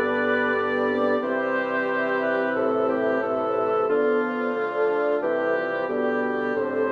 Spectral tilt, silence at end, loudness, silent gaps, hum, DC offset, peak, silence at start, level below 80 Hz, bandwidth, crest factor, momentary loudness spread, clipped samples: -7 dB/octave; 0 s; -24 LUFS; none; none; under 0.1%; -12 dBFS; 0 s; -68 dBFS; 6.2 kHz; 12 dB; 3 LU; under 0.1%